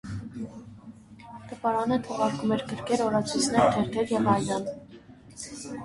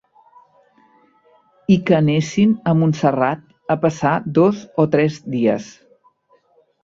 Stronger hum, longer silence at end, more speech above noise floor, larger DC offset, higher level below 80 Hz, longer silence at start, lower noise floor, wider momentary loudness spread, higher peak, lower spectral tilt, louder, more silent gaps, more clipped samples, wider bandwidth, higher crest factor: neither; second, 0 s vs 1.15 s; second, 23 dB vs 42 dB; neither; about the same, -56 dBFS vs -56 dBFS; second, 0.05 s vs 1.7 s; second, -49 dBFS vs -58 dBFS; first, 22 LU vs 7 LU; second, -8 dBFS vs -2 dBFS; second, -5 dB/octave vs -7.5 dB/octave; second, -27 LUFS vs -18 LUFS; neither; neither; first, 11.5 kHz vs 7.6 kHz; about the same, 20 dB vs 16 dB